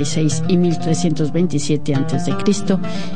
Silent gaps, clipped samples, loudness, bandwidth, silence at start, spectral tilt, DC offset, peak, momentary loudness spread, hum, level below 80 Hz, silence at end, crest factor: none; under 0.1%; -18 LUFS; 10 kHz; 0 s; -6 dB/octave; 8%; -4 dBFS; 3 LU; none; -48 dBFS; 0 s; 14 dB